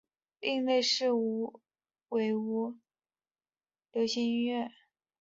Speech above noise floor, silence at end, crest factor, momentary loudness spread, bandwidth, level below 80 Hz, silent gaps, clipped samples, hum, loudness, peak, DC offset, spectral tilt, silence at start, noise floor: over 59 dB; 0.5 s; 18 dB; 11 LU; 7.8 kHz; -80 dBFS; none; under 0.1%; none; -32 LUFS; -16 dBFS; under 0.1%; -3.5 dB/octave; 0.4 s; under -90 dBFS